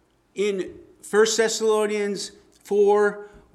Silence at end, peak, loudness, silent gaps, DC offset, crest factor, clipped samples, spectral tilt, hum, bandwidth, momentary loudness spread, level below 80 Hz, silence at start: 0.3 s; -8 dBFS; -22 LUFS; none; under 0.1%; 16 dB; under 0.1%; -3 dB/octave; none; 13.5 kHz; 17 LU; -64 dBFS; 0.35 s